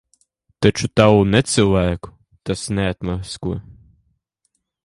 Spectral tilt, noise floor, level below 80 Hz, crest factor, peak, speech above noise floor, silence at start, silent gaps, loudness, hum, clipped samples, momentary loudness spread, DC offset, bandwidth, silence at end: -5.5 dB/octave; -71 dBFS; -38 dBFS; 20 dB; 0 dBFS; 54 dB; 0.6 s; none; -18 LUFS; none; under 0.1%; 14 LU; under 0.1%; 11.5 kHz; 1.1 s